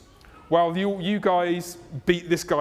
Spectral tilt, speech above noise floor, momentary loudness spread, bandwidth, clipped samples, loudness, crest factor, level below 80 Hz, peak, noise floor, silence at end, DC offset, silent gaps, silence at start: -5.5 dB/octave; 26 dB; 7 LU; 16 kHz; under 0.1%; -24 LUFS; 18 dB; -54 dBFS; -6 dBFS; -50 dBFS; 0 s; under 0.1%; none; 0.5 s